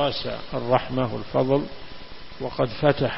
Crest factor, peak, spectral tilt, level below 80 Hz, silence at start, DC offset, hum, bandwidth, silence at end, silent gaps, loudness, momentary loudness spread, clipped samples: 20 dB; -4 dBFS; -10.5 dB/octave; -46 dBFS; 0 s; under 0.1%; none; 5.8 kHz; 0 s; none; -25 LUFS; 19 LU; under 0.1%